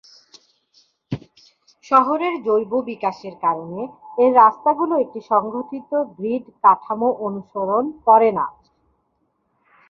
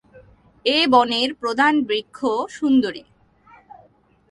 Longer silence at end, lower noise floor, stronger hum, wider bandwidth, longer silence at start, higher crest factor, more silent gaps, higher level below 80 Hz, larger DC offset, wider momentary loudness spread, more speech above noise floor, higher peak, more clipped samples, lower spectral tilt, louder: about the same, 1.4 s vs 1.3 s; first, -69 dBFS vs -56 dBFS; neither; second, 6.8 kHz vs 11.5 kHz; first, 1.1 s vs 0.15 s; about the same, 20 dB vs 20 dB; neither; about the same, -64 dBFS vs -60 dBFS; neither; first, 15 LU vs 10 LU; first, 50 dB vs 37 dB; about the same, 0 dBFS vs -2 dBFS; neither; first, -7.5 dB/octave vs -3.5 dB/octave; about the same, -19 LUFS vs -19 LUFS